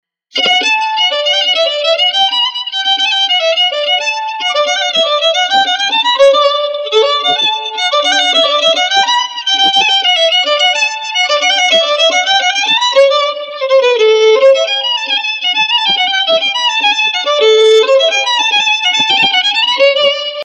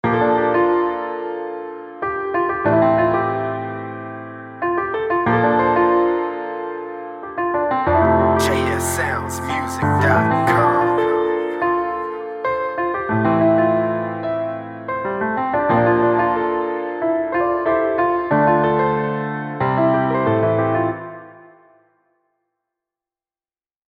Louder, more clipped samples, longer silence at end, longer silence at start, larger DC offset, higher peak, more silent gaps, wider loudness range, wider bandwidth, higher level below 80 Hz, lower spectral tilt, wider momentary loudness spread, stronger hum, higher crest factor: first, -10 LUFS vs -19 LUFS; neither; second, 0 s vs 2.45 s; first, 0.35 s vs 0.05 s; neither; about the same, 0 dBFS vs -2 dBFS; neither; about the same, 2 LU vs 3 LU; second, 9.8 kHz vs 16 kHz; second, -72 dBFS vs -46 dBFS; second, 1 dB/octave vs -6.5 dB/octave; second, 5 LU vs 12 LU; neither; about the same, 12 dB vs 16 dB